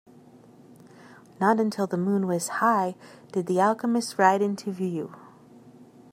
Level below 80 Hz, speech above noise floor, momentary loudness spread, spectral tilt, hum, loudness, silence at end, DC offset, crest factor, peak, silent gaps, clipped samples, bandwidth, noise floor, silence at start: -76 dBFS; 27 dB; 10 LU; -5.5 dB/octave; none; -25 LUFS; 0.3 s; under 0.1%; 22 dB; -4 dBFS; none; under 0.1%; 16 kHz; -52 dBFS; 1.1 s